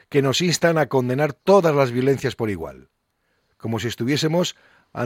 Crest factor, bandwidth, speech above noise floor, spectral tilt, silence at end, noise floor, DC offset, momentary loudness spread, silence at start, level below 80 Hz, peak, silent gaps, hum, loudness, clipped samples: 16 dB; 16.5 kHz; 49 dB; -5 dB/octave; 0 s; -70 dBFS; under 0.1%; 12 LU; 0.1 s; -56 dBFS; -4 dBFS; none; none; -20 LUFS; under 0.1%